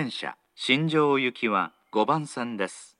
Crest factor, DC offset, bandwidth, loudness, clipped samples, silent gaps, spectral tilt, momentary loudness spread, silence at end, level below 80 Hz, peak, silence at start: 20 dB; under 0.1%; 11 kHz; -26 LUFS; under 0.1%; none; -5 dB/octave; 10 LU; 0.15 s; -86 dBFS; -6 dBFS; 0 s